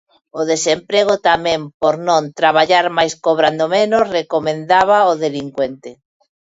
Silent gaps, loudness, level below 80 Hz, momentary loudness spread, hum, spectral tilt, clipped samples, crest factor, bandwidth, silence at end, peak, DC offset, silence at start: 1.74-1.80 s; -15 LUFS; -56 dBFS; 9 LU; none; -3.5 dB/octave; under 0.1%; 16 dB; 8 kHz; 0.65 s; 0 dBFS; under 0.1%; 0.35 s